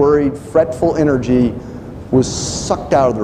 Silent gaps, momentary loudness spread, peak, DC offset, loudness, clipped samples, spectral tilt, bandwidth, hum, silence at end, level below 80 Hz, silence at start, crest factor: none; 8 LU; -2 dBFS; under 0.1%; -16 LUFS; under 0.1%; -6 dB/octave; 11 kHz; none; 0 s; -36 dBFS; 0 s; 14 dB